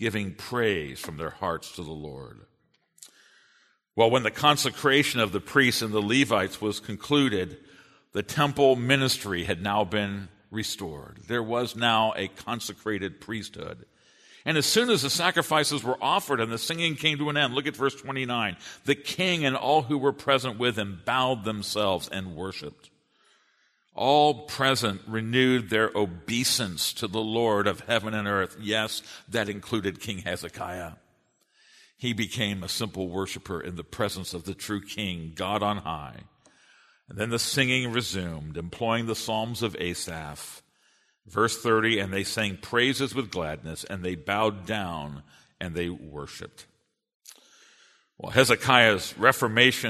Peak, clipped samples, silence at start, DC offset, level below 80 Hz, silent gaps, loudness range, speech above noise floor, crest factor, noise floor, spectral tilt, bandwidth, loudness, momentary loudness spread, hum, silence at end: -2 dBFS; under 0.1%; 0 s; under 0.1%; -58 dBFS; 47.15-47.20 s; 8 LU; 41 dB; 26 dB; -68 dBFS; -4 dB/octave; 13.5 kHz; -26 LUFS; 14 LU; none; 0 s